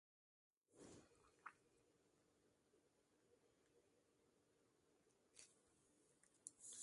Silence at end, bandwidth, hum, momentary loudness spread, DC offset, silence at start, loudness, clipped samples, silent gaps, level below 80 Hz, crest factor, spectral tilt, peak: 0 s; 11.5 kHz; none; 9 LU; under 0.1%; 0.7 s; -64 LUFS; under 0.1%; none; under -90 dBFS; 34 dB; -1.5 dB/octave; -34 dBFS